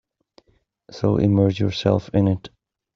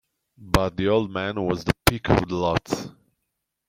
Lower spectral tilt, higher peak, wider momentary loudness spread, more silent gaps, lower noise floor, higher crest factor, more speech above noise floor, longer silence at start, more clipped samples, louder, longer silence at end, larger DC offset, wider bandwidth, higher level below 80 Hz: first, -8 dB/octave vs -5.5 dB/octave; second, -4 dBFS vs 0 dBFS; about the same, 8 LU vs 7 LU; neither; second, -64 dBFS vs -79 dBFS; second, 18 dB vs 24 dB; second, 45 dB vs 56 dB; first, 0.9 s vs 0.4 s; neither; first, -20 LUFS vs -24 LUFS; second, 0.5 s vs 0.8 s; neither; second, 6.8 kHz vs 16.5 kHz; second, -50 dBFS vs -38 dBFS